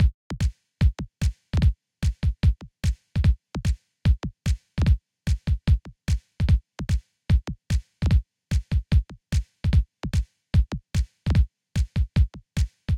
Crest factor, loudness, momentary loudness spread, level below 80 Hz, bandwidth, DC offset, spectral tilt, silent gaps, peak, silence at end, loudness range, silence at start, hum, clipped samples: 14 dB; -26 LUFS; 6 LU; -26 dBFS; 11 kHz; under 0.1%; -6.5 dB/octave; 0.14-0.30 s; -10 dBFS; 0 s; 1 LU; 0 s; none; under 0.1%